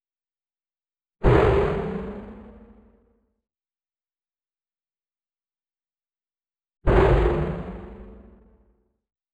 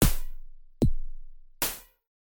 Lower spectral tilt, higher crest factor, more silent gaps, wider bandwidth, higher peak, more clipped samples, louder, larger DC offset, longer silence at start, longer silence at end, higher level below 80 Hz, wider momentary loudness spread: first, -9 dB/octave vs -4.5 dB/octave; about the same, 22 dB vs 20 dB; neither; second, 8.4 kHz vs 17.5 kHz; first, -4 dBFS vs -8 dBFS; neither; first, -22 LUFS vs -31 LUFS; neither; first, 1.2 s vs 0 s; first, 1.2 s vs 0.6 s; about the same, -32 dBFS vs -32 dBFS; first, 22 LU vs 18 LU